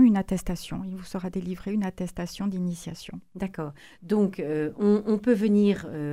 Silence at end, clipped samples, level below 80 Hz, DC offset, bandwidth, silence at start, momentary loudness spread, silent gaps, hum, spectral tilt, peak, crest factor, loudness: 0 s; under 0.1%; -48 dBFS; 0.1%; 15 kHz; 0 s; 15 LU; none; none; -7 dB/octave; -10 dBFS; 16 dB; -27 LUFS